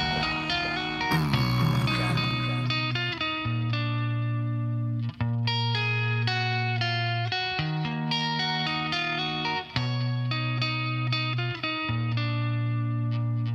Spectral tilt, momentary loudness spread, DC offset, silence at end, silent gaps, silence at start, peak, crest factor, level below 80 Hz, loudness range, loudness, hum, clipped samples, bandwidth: -6 dB/octave; 4 LU; under 0.1%; 0 s; none; 0 s; -10 dBFS; 18 dB; -50 dBFS; 2 LU; -27 LUFS; none; under 0.1%; 12.5 kHz